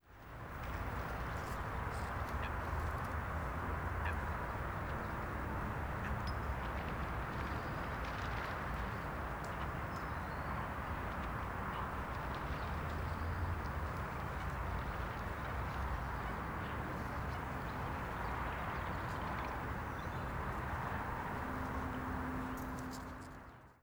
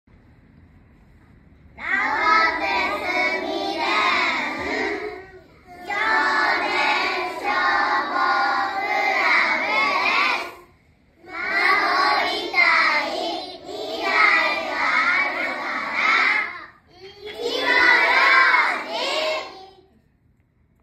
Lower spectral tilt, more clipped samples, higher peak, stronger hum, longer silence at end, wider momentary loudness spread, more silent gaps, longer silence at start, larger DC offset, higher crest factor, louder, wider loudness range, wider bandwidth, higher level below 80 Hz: first, -6.5 dB/octave vs -2 dB/octave; neither; second, -24 dBFS vs -2 dBFS; neither; second, 0.1 s vs 1.15 s; second, 2 LU vs 14 LU; neither; second, 0.05 s vs 1.75 s; neither; about the same, 16 dB vs 20 dB; second, -41 LUFS vs -19 LUFS; second, 1 LU vs 4 LU; first, over 20 kHz vs 15 kHz; first, -46 dBFS vs -58 dBFS